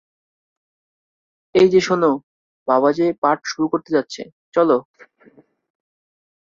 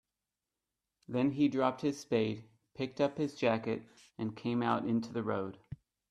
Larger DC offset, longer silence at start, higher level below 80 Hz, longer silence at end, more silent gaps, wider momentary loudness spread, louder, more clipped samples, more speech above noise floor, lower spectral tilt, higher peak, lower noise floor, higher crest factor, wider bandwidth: neither; first, 1.55 s vs 1.1 s; first, -62 dBFS vs -70 dBFS; first, 1.65 s vs 0.35 s; first, 2.23-2.66 s, 3.18-3.22 s, 4.32-4.52 s vs none; second, 11 LU vs 14 LU; first, -18 LUFS vs -34 LUFS; neither; second, 35 dB vs 57 dB; about the same, -5.5 dB/octave vs -6.5 dB/octave; first, -2 dBFS vs -14 dBFS; second, -52 dBFS vs -90 dBFS; about the same, 18 dB vs 20 dB; second, 7.6 kHz vs 11.5 kHz